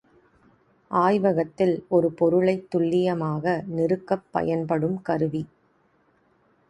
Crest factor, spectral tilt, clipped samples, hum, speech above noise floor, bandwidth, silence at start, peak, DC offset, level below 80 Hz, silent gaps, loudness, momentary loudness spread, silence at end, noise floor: 18 dB; -8.5 dB/octave; under 0.1%; none; 41 dB; 10.5 kHz; 0.9 s; -6 dBFS; under 0.1%; -62 dBFS; none; -24 LUFS; 6 LU; 1.25 s; -64 dBFS